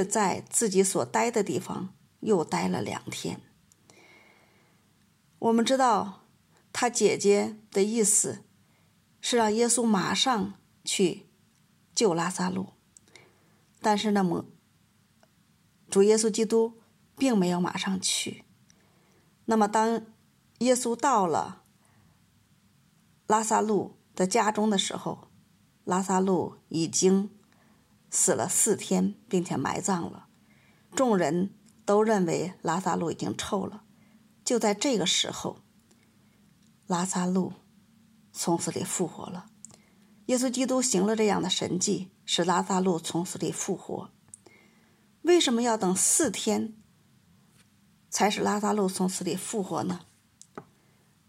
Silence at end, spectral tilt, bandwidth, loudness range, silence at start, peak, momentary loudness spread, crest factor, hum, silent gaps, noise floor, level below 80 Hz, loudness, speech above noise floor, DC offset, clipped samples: 0.65 s; -4 dB/octave; 16 kHz; 5 LU; 0 s; -10 dBFS; 14 LU; 18 dB; none; none; -65 dBFS; -72 dBFS; -27 LUFS; 38 dB; under 0.1%; under 0.1%